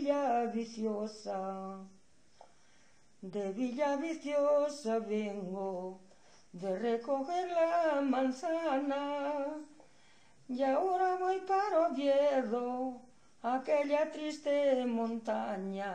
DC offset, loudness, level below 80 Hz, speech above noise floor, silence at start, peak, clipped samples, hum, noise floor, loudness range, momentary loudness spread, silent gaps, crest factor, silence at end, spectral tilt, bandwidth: under 0.1%; -34 LUFS; -80 dBFS; 34 dB; 0 s; -20 dBFS; under 0.1%; none; -67 dBFS; 6 LU; 11 LU; none; 14 dB; 0 s; -5.5 dB/octave; 9.8 kHz